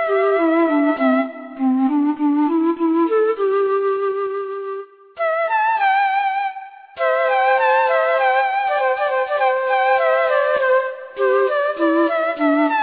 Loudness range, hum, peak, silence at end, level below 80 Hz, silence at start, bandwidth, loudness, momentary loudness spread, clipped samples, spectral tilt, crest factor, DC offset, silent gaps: 3 LU; none; -6 dBFS; 0 s; -70 dBFS; 0 s; 5 kHz; -18 LUFS; 8 LU; under 0.1%; -7 dB/octave; 12 dB; under 0.1%; none